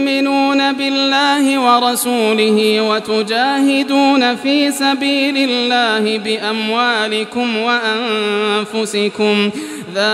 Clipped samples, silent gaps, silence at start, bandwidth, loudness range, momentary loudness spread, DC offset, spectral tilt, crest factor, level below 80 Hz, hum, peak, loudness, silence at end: under 0.1%; none; 0 s; 14.5 kHz; 3 LU; 5 LU; under 0.1%; -3.5 dB/octave; 14 dB; -68 dBFS; none; 0 dBFS; -14 LUFS; 0 s